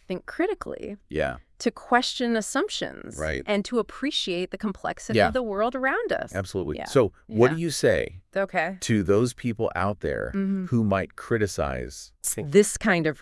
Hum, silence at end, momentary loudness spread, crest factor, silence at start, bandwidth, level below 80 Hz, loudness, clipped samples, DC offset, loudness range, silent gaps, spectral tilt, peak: none; 0 s; 9 LU; 22 dB; 0.1 s; 12 kHz; -48 dBFS; -26 LUFS; under 0.1%; under 0.1%; 3 LU; none; -4.5 dB/octave; -4 dBFS